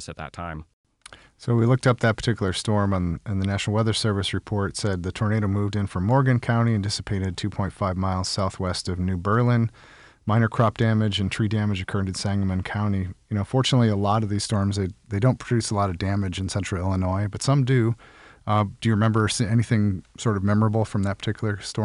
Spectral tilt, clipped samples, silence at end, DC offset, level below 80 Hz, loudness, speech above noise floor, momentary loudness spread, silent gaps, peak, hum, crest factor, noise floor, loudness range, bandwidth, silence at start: -6 dB/octave; under 0.1%; 0 s; under 0.1%; -52 dBFS; -24 LUFS; 26 dB; 7 LU; 0.73-0.84 s; -10 dBFS; none; 14 dB; -49 dBFS; 2 LU; 11 kHz; 0 s